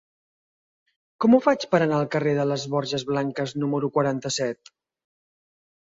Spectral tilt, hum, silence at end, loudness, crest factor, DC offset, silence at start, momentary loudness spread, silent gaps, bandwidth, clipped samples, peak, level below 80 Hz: -5.5 dB/octave; none; 1.3 s; -23 LUFS; 20 dB; under 0.1%; 1.2 s; 8 LU; none; 7.8 kHz; under 0.1%; -4 dBFS; -66 dBFS